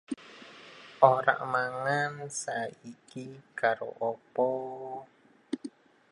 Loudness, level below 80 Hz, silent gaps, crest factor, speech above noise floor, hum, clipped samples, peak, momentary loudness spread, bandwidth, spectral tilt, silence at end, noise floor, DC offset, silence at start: -30 LUFS; -80 dBFS; none; 28 dB; 21 dB; none; under 0.1%; -4 dBFS; 24 LU; 11.5 kHz; -4.5 dB/octave; 0.4 s; -51 dBFS; under 0.1%; 0.1 s